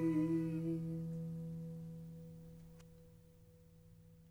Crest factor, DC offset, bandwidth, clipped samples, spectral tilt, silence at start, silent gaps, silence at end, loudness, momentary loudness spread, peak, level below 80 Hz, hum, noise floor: 16 dB; under 0.1%; 15 kHz; under 0.1%; -9.5 dB/octave; 0 s; none; 0 s; -42 LUFS; 26 LU; -28 dBFS; -68 dBFS; none; -63 dBFS